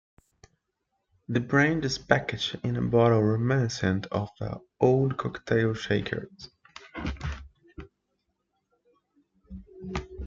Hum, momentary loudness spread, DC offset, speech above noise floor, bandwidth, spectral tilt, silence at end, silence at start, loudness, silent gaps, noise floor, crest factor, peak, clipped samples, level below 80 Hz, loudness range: none; 22 LU; under 0.1%; 54 dB; 7.6 kHz; -6.5 dB/octave; 0 s; 1.3 s; -27 LUFS; none; -79 dBFS; 26 dB; -4 dBFS; under 0.1%; -50 dBFS; 17 LU